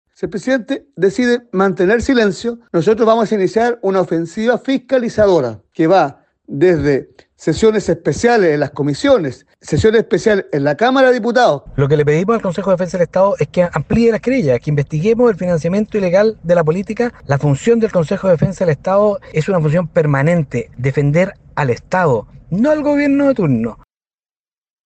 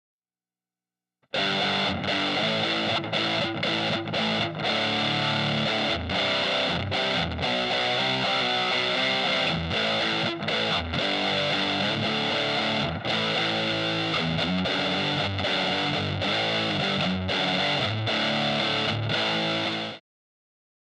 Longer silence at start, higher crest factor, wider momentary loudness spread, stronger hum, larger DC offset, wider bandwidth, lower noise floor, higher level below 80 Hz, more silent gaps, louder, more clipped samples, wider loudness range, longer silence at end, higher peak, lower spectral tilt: second, 0.2 s vs 1.35 s; about the same, 14 dB vs 14 dB; first, 7 LU vs 3 LU; neither; neither; second, 8.8 kHz vs 11 kHz; about the same, under -90 dBFS vs under -90 dBFS; first, -42 dBFS vs -56 dBFS; neither; first, -15 LUFS vs -25 LUFS; neither; about the same, 2 LU vs 1 LU; about the same, 1.1 s vs 1 s; first, 0 dBFS vs -12 dBFS; first, -7 dB/octave vs -4.5 dB/octave